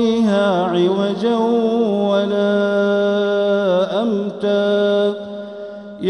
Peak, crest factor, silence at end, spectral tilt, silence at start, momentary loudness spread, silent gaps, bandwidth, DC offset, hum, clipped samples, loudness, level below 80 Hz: -6 dBFS; 12 dB; 0 s; -7 dB/octave; 0 s; 8 LU; none; 10 kHz; under 0.1%; none; under 0.1%; -17 LUFS; -60 dBFS